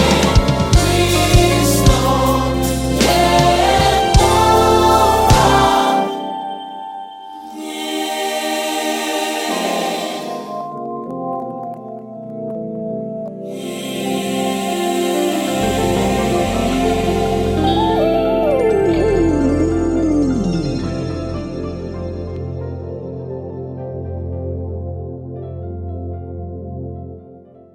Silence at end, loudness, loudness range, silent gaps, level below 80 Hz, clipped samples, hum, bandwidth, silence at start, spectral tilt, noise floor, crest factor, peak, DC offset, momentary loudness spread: 0.35 s; -16 LUFS; 14 LU; none; -28 dBFS; under 0.1%; none; 16.5 kHz; 0 s; -5 dB/octave; -41 dBFS; 16 dB; 0 dBFS; under 0.1%; 17 LU